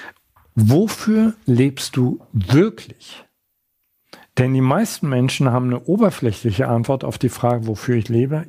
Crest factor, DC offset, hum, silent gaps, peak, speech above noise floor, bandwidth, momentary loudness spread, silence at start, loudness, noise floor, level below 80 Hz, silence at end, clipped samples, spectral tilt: 16 dB; under 0.1%; none; none; -2 dBFS; 53 dB; 15.5 kHz; 6 LU; 0 s; -18 LUFS; -71 dBFS; -52 dBFS; 0 s; under 0.1%; -7 dB/octave